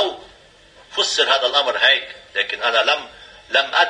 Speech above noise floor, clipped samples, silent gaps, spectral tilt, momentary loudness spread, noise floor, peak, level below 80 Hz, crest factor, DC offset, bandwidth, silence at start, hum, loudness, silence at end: 30 dB; under 0.1%; none; 0.5 dB/octave; 12 LU; -48 dBFS; -2 dBFS; -60 dBFS; 18 dB; under 0.1%; 10 kHz; 0 s; none; -17 LUFS; 0 s